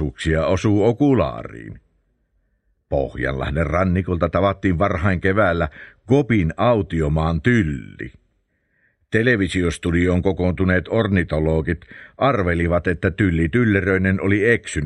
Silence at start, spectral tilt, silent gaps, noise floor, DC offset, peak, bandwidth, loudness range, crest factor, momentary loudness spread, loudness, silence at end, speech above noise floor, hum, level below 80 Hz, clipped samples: 0 s; -7.5 dB/octave; none; -67 dBFS; under 0.1%; 0 dBFS; 10.5 kHz; 3 LU; 18 dB; 8 LU; -19 LUFS; 0 s; 48 dB; none; -34 dBFS; under 0.1%